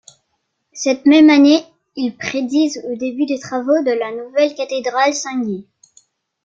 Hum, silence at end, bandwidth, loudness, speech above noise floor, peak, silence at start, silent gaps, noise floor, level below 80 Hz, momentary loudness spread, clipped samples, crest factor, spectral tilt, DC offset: none; 0.8 s; 7.6 kHz; -16 LUFS; 55 dB; -2 dBFS; 0.75 s; none; -71 dBFS; -64 dBFS; 14 LU; under 0.1%; 14 dB; -3.5 dB/octave; under 0.1%